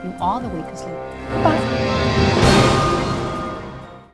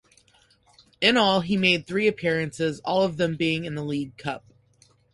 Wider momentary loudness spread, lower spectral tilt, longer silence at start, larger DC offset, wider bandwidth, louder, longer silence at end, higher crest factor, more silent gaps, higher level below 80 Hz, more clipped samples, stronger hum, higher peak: first, 17 LU vs 11 LU; about the same, -5.5 dB/octave vs -5 dB/octave; second, 0 s vs 1 s; first, 0.2% vs under 0.1%; about the same, 11 kHz vs 11.5 kHz; first, -18 LUFS vs -24 LUFS; second, 0.1 s vs 0.75 s; about the same, 18 dB vs 20 dB; neither; first, -32 dBFS vs -60 dBFS; neither; neither; first, 0 dBFS vs -6 dBFS